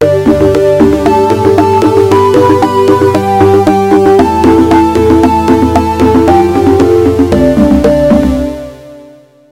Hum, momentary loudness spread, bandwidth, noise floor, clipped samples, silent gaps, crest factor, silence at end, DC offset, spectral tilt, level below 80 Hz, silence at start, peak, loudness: none; 2 LU; 16 kHz; -36 dBFS; 3%; none; 6 dB; 0.5 s; under 0.1%; -7 dB/octave; -26 dBFS; 0 s; 0 dBFS; -7 LUFS